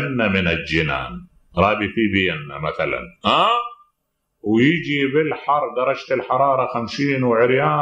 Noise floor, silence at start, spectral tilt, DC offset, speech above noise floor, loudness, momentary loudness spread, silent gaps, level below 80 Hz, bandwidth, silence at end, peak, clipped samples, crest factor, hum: -73 dBFS; 0 s; -6.5 dB/octave; under 0.1%; 54 dB; -19 LUFS; 9 LU; none; -46 dBFS; 9.6 kHz; 0 s; -2 dBFS; under 0.1%; 18 dB; none